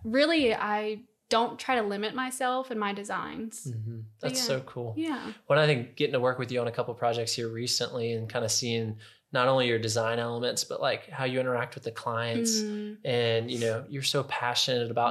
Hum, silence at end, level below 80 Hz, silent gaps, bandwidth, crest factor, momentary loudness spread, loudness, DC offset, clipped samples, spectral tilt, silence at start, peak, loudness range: none; 0 s; -70 dBFS; none; 14.5 kHz; 20 dB; 11 LU; -29 LUFS; under 0.1%; under 0.1%; -4 dB/octave; 0 s; -10 dBFS; 3 LU